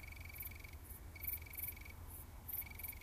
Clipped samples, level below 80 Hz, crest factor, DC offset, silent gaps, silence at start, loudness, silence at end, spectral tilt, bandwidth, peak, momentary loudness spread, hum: under 0.1%; -56 dBFS; 22 dB; under 0.1%; none; 0 s; -47 LUFS; 0 s; -3.5 dB/octave; 15.5 kHz; -28 dBFS; 9 LU; none